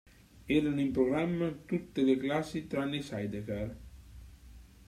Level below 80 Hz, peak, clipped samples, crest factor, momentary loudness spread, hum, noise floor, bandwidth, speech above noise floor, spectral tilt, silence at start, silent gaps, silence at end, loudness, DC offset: -54 dBFS; -16 dBFS; under 0.1%; 18 dB; 11 LU; none; -54 dBFS; 13.5 kHz; 22 dB; -7 dB/octave; 0.35 s; none; 0.2 s; -33 LUFS; under 0.1%